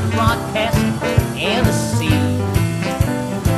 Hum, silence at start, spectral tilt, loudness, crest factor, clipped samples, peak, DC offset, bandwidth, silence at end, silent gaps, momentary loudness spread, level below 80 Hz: none; 0 s; -5.5 dB/octave; -18 LUFS; 16 dB; under 0.1%; -2 dBFS; under 0.1%; 13.5 kHz; 0 s; none; 3 LU; -30 dBFS